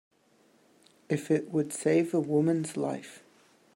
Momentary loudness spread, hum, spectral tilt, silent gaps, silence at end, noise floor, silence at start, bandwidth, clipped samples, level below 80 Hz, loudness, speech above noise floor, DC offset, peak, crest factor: 8 LU; none; -6.5 dB/octave; none; 0.6 s; -65 dBFS; 1.1 s; 16 kHz; under 0.1%; -78 dBFS; -29 LUFS; 37 dB; under 0.1%; -14 dBFS; 18 dB